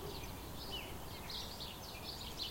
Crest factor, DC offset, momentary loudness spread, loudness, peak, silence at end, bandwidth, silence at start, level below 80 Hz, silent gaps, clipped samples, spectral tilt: 18 dB; under 0.1%; 4 LU; -45 LUFS; -28 dBFS; 0 s; 16.5 kHz; 0 s; -56 dBFS; none; under 0.1%; -3.5 dB/octave